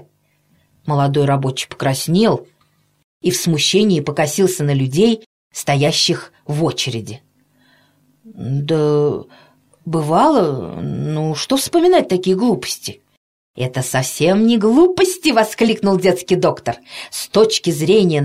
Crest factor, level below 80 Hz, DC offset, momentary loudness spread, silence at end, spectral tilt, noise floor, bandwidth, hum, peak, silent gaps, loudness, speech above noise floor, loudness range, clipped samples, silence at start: 14 dB; -52 dBFS; under 0.1%; 12 LU; 0 s; -5 dB/octave; -60 dBFS; 16 kHz; 50 Hz at -45 dBFS; -2 dBFS; 3.04-3.20 s, 5.26-5.51 s, 13.17-13.54 s; -16 LUFS; 44 dB; 5 LU; under 0.1%; 0.85 s